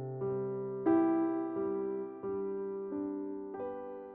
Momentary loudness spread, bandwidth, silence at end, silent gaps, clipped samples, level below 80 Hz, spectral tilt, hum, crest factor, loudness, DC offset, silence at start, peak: 12 LU; 3.1 kHz; 0 s; none; under 0.1%; -72 dBFS; -10 dB/octave; none; 16 dB; -35 LUFS; under 0.1%; 0 s; -18 dBFS